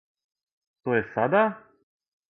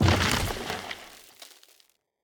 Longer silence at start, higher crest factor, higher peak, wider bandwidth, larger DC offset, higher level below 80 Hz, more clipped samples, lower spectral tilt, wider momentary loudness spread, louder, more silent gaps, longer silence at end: first, 0.85 s vs 0 s; about the same, 20 dB vs 22 dB; about the same, -8 dBFS vs -6 dBFS; second, 4 kHz vs over 20 kHz; neither; second, -66 dBFS vs -42 dBFS; neither; first, -9.5 dB/octave vs -4 dB/octave; second, 14 LU vs 24 LU; first, -25 LUFS vs -28 LUFS; neither; about the same, 0.7 s vs 0.8 s